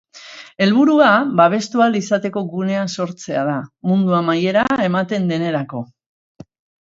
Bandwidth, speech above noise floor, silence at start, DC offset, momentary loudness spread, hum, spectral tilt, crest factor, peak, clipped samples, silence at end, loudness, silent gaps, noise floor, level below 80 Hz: 7.8 kHz; 23 dB; 0.15 s; under 0.1%; 13 LU; none; -6 dB/octave; 18 dB; 0 dBFS; under 0.1%; 1 s; -17 LUFS; none; -39 dBFS; -60 dBFS